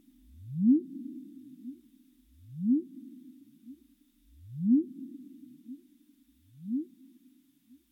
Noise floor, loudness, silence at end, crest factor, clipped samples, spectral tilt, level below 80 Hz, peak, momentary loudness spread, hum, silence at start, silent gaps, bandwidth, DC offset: -64 dBFS; -30 LUFS; 1.05 s; 20 dB; under 0.1%; -11 dB/octave; -70 dBFS; -14 dBFS; 26 LU; none; 0.35 s; none; 0.8 kHz; under 0.1%